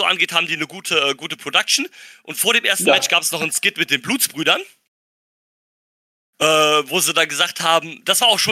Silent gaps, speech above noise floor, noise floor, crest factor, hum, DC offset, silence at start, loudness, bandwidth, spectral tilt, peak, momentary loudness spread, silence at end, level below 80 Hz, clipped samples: 4.88-6.33 s; over 72 dB; under -90 dBFS; 18 dB; none; under 0.1%; 0 s; -16 LUFS; 16 kHz; -1 dB/octave; -2 dBFS; 6 LU; 0 s; -74 dBFS; under 0.1%